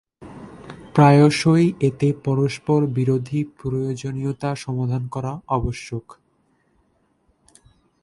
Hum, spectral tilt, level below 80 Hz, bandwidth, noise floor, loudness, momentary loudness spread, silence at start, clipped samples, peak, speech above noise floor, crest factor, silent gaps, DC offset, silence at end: none; -7 dB/octave; -46 dBFS; 11.5 kHz; -64 dBFS; -20 LUFS; 19 LU; 0.2 s; under 0.1%; 0 dBFS; 45 dB; 20 dB; none; under 0.1%; 2 s